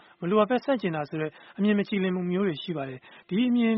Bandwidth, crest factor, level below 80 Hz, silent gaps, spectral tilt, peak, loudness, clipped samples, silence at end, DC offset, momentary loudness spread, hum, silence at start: 5.8 kHz; 18 dB; -70 dBFS; none; -5.5 dB/octave; -8 dBFS; -27 LUFS; under 0.1%; 0 s; under 0.1%; 11 LU; none; 0.2 s